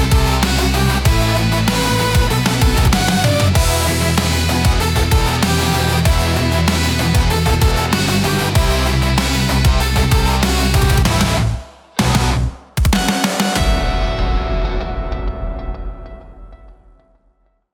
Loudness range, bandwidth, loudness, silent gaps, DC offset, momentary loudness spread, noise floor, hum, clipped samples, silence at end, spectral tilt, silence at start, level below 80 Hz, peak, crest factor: 5 LU; 18 kHz; -15 LUFS; none; under 0.1%; 8 LU; -58 dBFS; none; under 0.1%; 1 s; -4.5 dB/octave; 0 s; -20 dBFS; -2 dBFS; 14 dB